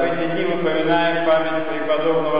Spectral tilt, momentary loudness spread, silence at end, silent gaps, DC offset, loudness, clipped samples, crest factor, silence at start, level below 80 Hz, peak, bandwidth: -10.5 dB/octave; 4 LU; 0 s; none; 4%; -20 LUFS; under 0.1%; 12 dB; 0 s; -62 dBFS; -8 dBFS; 5.2 kHz